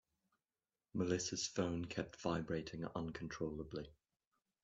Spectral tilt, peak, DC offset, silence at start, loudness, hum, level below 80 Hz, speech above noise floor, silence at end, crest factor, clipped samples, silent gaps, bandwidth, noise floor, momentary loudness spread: -4.5 dB/octave; -24 dBFS; under 0.1%; 0.95 s; -43 LUFS; none; -66 dBFS; over 48 dB; 0.7 s; 20 dB; under 0.1%; none; 8.2 kHz; under -90 dBFS; 9 LU